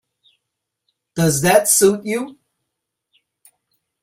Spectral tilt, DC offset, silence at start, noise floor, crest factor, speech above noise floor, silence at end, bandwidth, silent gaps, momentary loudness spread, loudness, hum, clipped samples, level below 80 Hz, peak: -4 dB/octave; under 0.1%; 1.15 s; -79 dBFS; 20 dB; 63 dB; 1.7 s; 16 kHz; none; 16 LU; -15 LUFS; none; under 0.1%; -56 dBFS; 0 dBFS